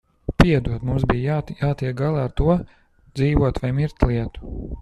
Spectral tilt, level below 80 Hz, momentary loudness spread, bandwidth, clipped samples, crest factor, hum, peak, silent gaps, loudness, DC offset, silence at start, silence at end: -8 dB/octave; -30 dBFS; 14 LU; 11.5 kHz; under 0.1%; 20 dB; none; -2 dBFS; none; -21 LUFS; under 0.1%; 0.3 s; 0 s